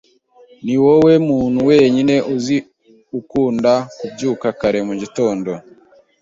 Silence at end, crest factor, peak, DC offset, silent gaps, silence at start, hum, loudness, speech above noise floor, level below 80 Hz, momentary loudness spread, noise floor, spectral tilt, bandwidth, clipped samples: 0.6 s; 16 dB; -2 dBFS; under 0.1%; none; 0.65 s; none; -16 LUFS; 33 dB; -52 dBFS; 15 LU; -48 dBFS; -6.5 dB/octave; 7.8 kHz; under 0.1%